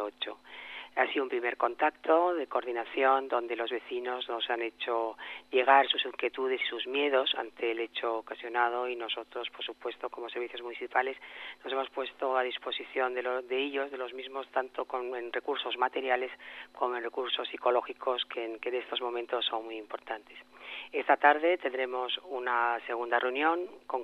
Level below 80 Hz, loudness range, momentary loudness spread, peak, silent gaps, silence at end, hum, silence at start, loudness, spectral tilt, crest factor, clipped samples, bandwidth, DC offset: -80 dBFS; 5 LU; 12 LU; -8 dBFS; none; 0 s; none; 0 s; -31 LUFS; -3 dB/octave; 24 dB; under 0.1%; 6.2 kHz; under 0.1%